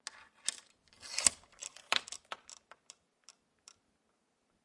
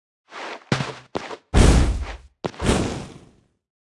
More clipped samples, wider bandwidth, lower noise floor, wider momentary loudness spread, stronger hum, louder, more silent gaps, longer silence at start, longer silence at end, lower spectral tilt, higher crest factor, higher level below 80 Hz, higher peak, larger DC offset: neither; about the same, 11.5 kHz vs 12 kHz; first, -78 dBFS vs -54 dBFS; first, 26 LU vs 19 LU; neither; second, -35 LUFS vs -22 LUFS; neither; second, 0.15 s vs 0.3 s; first, 2.1 s vs 0.75 s; second, 1.5 dB/octave vs -5.5 dB/octave; first, 36 dB vs 22 dB; second, -74 dBFS vs -26 dBFS; second, -6 dBFS vs -2 dBFS; neither